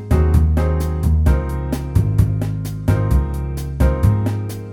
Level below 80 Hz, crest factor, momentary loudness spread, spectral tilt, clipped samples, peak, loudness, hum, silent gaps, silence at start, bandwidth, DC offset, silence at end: -22 dBFS; 14 dB; 8 LU; -8 dB/octave; under 0.1%; -2 dBFS; -18 LUFS; none; none; 0 s; 17 kHz; under 0.1%; 0 s